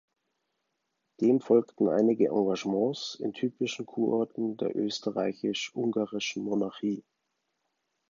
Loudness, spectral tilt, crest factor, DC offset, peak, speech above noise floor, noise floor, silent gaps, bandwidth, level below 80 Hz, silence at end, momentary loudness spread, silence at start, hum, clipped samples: -29 LUFS; -5.5 dB/octave; 20 dB; under 0.1%; -10 dBFS; 52 dB; -81 dBFS; none; 7.6 kHz; -76 dBFS; 1.1 s; 8 LU; 1.2 s; none; under 0.1%